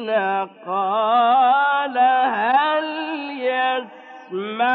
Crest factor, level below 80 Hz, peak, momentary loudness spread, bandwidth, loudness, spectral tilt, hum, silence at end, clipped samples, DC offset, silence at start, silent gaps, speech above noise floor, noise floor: 12 dB; under -90 dBFS; -8 dBFS; 11 LU; 4.7 kHz; -19 LUFS; -6.5 dB/octave; none; 0 s; under 0.1%; under 0.1%; 0 s; none; 21 dB; -39 dBFS